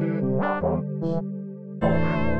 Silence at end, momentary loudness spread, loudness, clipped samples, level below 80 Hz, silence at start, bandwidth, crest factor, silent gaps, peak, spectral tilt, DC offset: 0 s; 10 LU; -26 LUFS; under 0.1%; -42 dBFS; 0 s; 5.6 kHz; 14 dB; none; -10 dBFS; -10 dB/octave; under 0.1%